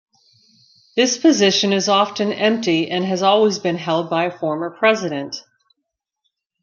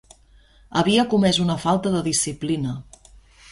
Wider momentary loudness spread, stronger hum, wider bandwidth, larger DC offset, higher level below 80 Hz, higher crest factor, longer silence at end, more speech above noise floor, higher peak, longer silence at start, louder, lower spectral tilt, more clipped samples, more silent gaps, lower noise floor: about the same, 9 LU vs 8 LU; neither; second, 7.4 kHz vs 11.5 kHz; neither; second, -68 dBFS vs -50 dBFS; about the same, 18 dB vs 18 dB; first, 1.2 s vs 0.7 s; first, 61 dB vs 33 dB; first, -2 dBFS vs -6 dBFS; first, 0.95 s vs 0.7 s; first, -18 LUFS vs -21 LUFS; about the same, -4 dB/octave vs -4.5 dB/octave; neither; neither; first, -78 dBFS vs -53 dBFS